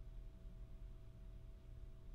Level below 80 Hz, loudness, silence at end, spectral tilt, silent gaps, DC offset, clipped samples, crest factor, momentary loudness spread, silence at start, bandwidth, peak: -56 dBFS; -60 LUFS; 0 s; -7.5 dB/octave; none; under 0.1%; under 0.1%; 12 dB; 1 LU; 0 s; 8.2 kHz; -42 dBFS